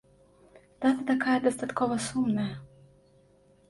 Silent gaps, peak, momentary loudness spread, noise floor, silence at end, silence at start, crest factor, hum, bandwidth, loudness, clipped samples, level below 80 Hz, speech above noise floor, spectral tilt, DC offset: none; -12 dBFS; 6 LU; -61 dBFS; 1.05 s; 0.55 s; 18 dB; none; 11.5 kHz; -28 LUFS; under 0.1%; -64 dBFS; 34 dB; -5 dB/octave; under 0.1%